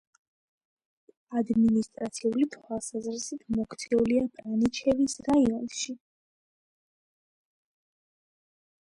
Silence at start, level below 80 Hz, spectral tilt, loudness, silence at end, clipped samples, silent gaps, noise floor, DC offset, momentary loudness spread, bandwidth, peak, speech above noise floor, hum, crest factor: 1.3 s; -60 dBFS; -5 dB/octave; -28 LUFS; 2.9 s; under 0.1%; none; under -90 dBFS; under 0.1%; 10 LU; 11.5 kHz; -14 dBFS; over 63 dB; none; 16 dB